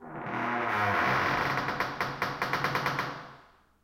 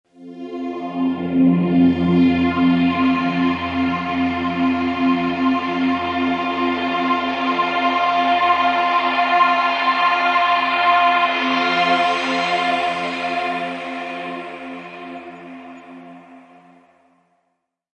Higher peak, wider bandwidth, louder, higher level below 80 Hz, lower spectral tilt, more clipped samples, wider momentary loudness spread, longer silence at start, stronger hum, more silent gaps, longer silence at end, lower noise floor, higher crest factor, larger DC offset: second, -12 dBFS vs -4 dBFS; first, 16.5 kHz vs 8.4 kHz; second, -29 LUFS vs -18 LUFS; about the same, -60 dBFS vs -60 dBFS; about the same, -5 dB/octave vs -6 dB/octave; neither; second, 10 LU vs 15 LU; second, 0 s vs 0.2 s; neither; neither; second, 0.4 s vs 1.6 s; second, -57 dBFS vs -72 dBFS; about the same, 20 dB vs 16 dB; neither